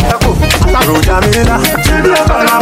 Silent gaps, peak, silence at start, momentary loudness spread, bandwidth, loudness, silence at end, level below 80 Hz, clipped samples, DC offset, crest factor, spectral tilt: none; 0 dBFS; 0 s; 1 LU; 17 kHz; -9 LUFS; 0 s; -16 dBFS; under 0.1%; under 0.1%; 8 dB; -4.5 dB/octave